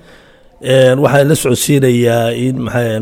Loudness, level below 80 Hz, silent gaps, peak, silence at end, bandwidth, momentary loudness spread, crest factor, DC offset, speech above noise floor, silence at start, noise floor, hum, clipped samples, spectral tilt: -12 LUFS; -44 dBFS; none; 0 dBFS; 0 s; 18 kHz; 7 LU; 12 dB; under 0.1%; 31 dB; 0.6 s; -42 dBFS; none; under 0.1%; -5.5 dB/octave